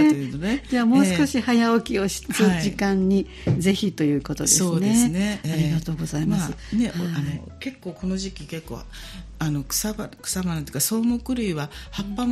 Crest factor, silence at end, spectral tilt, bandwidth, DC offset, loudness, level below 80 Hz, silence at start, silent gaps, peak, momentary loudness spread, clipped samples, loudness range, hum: 18 dB; 0 s; -4.5 dB/octave; 15 kHz; under 0.1%; -23 LUFS; -42 dBFS; 0 s; none; -4 dBFS; 14 LU; under 0.1%; 8 LU; none